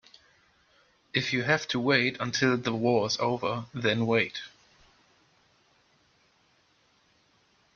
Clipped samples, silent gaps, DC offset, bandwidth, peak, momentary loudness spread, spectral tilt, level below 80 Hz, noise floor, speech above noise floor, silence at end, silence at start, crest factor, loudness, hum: under 0.1%; none; under 0.1%; 7.2 kHz; -8 dBFS; 7 LU; -4.5 dB/octave; -68 dBFS; -67 dBFS; 39 dB; 3.25 s; 1.15 s; 22 dB; -27 LUFS; none